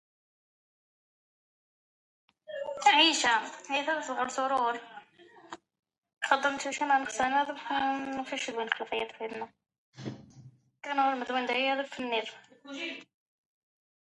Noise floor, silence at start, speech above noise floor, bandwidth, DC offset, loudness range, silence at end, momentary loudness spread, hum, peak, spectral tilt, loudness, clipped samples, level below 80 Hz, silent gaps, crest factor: -57 dBFS; 2.5 s; 27 dB; 11.5 kHz; under 0.1%; 6 LU; 1 s; 19 LU; none; -8 dBFS; -1.5 dB/octave; -29 LUFS; under 0.1%; -74 dBFS; 5.79-5.83 s, 5.98-6.02 s, 9.78-9.92 s; 24 dB